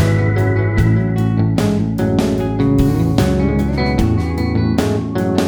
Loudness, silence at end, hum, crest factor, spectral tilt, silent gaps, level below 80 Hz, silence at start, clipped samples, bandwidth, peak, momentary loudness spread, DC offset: -16 LUFS; 0 s; none; 14 dB; -7.5 dB/octave; none; -26 dBFS; 0 s; under 0.1%; 19 kHz; 0 dBFS; 3 LU; under 0.1%